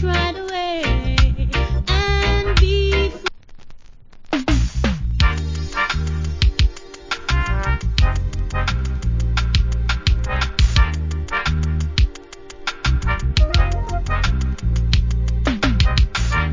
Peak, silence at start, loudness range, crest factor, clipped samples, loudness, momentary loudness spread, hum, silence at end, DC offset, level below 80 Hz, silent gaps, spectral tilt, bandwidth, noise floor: -2 dBFS; 0 s; 2 LU; 16 dB; under 0.1%; -20 LUFS; 7 LU; none; 0 s; under 0.1%; -20 dBFS; none; -5.5 dB/octave; 7.6 kHz; -39 dBFS